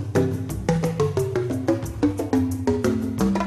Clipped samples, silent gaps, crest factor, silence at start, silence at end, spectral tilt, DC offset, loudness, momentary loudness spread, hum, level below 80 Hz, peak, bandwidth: under 0.1%; none; 16 dB; 0 s; 0 s; -7 dB/octave; under 0.1%; -24 LUFS; 2 LU; none; -40 dBFS; -8 dBFS; 14 kHz